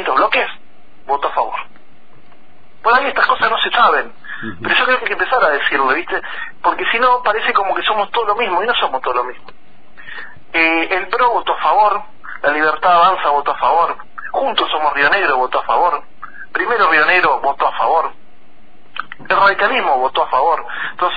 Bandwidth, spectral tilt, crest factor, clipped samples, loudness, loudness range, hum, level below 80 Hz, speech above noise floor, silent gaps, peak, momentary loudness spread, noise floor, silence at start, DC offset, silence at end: 5 kHz; -5 dB/octave; 14 dB; under 0.1%; -15 LUFS; 3 LU; none; -50 dBFS; 34 dB; none; -2 dBFS; 13 LU; -49 dBFS; 0 s; 4%; 0 s